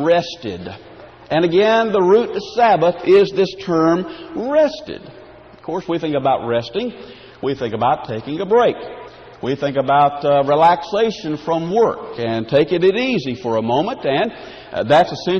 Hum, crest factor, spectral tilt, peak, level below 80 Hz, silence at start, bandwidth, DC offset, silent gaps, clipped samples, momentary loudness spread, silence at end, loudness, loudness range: none; 14 dB; -6.5 dB/octave; -2 dBFS; -52 dBFS; 0 s; 7 kHz; under 0.1%; none; under 0.1%; 15 LU; 0 s; -17 LUFS; 6 LU